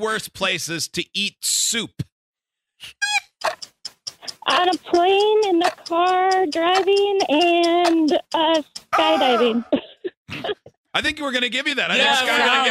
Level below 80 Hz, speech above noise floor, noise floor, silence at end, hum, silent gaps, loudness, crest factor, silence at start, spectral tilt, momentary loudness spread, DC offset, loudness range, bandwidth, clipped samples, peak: -60 dBFS; 43 dB; -62 dBFS; 0 s; none; 2.12-2.33 s, 10.17-10.25 s, 10.77-10.84 s; -19 LUFS; 16 dB; 0 s; -2 dB/octave; 15 LU; under 0.1%; 6 LU; 15 kHz; under 0.1%; -4 dBFS